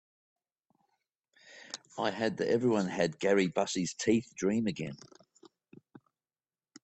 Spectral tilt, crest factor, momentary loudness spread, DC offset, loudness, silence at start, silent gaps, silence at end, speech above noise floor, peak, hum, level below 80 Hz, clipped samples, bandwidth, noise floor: -5 dB/octave; 20 dB; 16 LU; under 0.1%; -31 LUFS; 1.45 s; none; 1.9 s; over 59 dB; -14 dBFS; none; -70 dBFS; under 0.1%; 8.6 kHz; under -90 dBFS